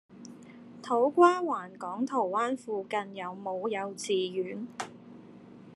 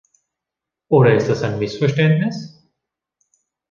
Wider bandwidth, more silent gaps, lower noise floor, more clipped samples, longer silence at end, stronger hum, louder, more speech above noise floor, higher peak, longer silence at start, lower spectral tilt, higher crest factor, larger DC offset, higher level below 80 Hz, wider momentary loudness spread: first, 12 kHz vs 7.2 kHz; neither; second, -51 dBFS vs -85 dBFS; neither; second, 0 s vs 1.25 s; neither; second, -30 LUFS vs -17 LUFS; second, 21 dB vs 69 dB; second, -8 dBFS vs -2 dBFS; second, 0.1 s vs 0.9 s; second, -4.5 dB/octave vs -7.5 dB/octave; first, 24 dB vs 18 dB; neither; second, -82 dBFS vs -54 dBFS; first, 26 LU vs 12 LU